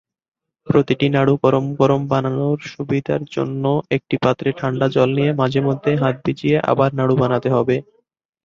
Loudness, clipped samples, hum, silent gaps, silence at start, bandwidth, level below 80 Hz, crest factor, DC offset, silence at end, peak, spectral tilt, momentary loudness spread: -18 LUFS; under 0.1%; none; none; 0.65 s; 7.2 kHz; -54 dBFS; 18 dB; under 0.1%; 0.65 s; 0 dBFS; -8 dB/octave; 6 LU